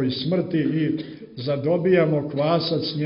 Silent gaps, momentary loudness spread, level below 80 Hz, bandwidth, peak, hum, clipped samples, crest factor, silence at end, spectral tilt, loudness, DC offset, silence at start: none; 10 LU; -60 dBFS; 5.6 kHz; -6 dBFS; none; under 0.1%; 16 dB; 0 s; -11 dB/octave; -22 LUFS; under 0.1%; 0 s